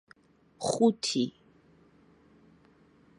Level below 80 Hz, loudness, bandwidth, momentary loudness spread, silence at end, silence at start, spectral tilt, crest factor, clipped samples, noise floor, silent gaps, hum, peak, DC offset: -74 dBFS; -29 LUFS; 11.5 kHz; 10 LU; 1.9 s; 0.6 s; -4.5 dB/octave; 22 dB; under 0.1%; -61 dBFS; none; none; -12 dBFS; under 0.1%